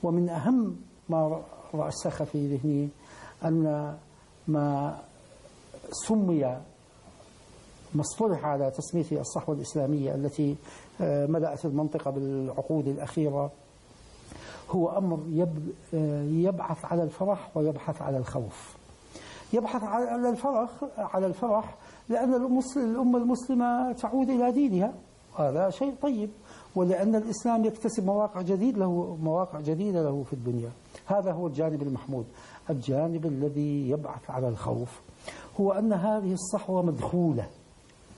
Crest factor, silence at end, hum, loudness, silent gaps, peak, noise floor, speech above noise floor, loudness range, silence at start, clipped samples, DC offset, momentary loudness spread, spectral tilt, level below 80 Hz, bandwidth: 14 dB; 0.05 s; none; -29 LUFS; none; -16 dBFS; -55 dBFS; 27 dB; 4 LU; 0 s; under 0.1%; under 0.1%; 13 LU; -7.5 dB/octave; -60 dBFS; 11.5 kHz